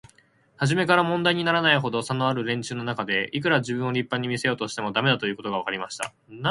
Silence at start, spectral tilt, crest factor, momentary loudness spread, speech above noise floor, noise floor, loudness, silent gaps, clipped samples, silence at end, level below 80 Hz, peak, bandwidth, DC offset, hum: 0.6 s; -5 dB/octave; 22 dB; 9 LU; 35 dB; -60 dBFS; -24 LUFS; none; under 0.1%; 0 s; -64 dBFS; -4 dBFS; 11.5 kHz; under 0.1%; none